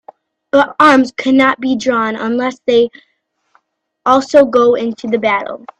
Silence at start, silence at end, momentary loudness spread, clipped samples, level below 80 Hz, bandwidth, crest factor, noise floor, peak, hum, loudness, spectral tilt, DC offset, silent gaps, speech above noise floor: 0.55 s; 0.2 s; 8 LU; under 0.1%; -56 dBFS; 10 kHz; 14 dB; -62 dBFS; 0 dBFS; none; -13 LUFS; -4.5 dB/octave; under 0.1%; none; 50 dB